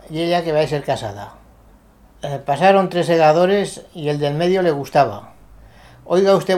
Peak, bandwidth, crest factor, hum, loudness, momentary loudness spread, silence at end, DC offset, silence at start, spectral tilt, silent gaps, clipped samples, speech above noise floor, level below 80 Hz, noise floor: 0 dBFS; 15 kHz; 18 dB; none; -17 LUFS; 15 LU; 0 s; under 0.1%; 0.1 s; -6 dB/octave; none; under 0.1%; 32 dB; -50 dBFS; -48 dBFS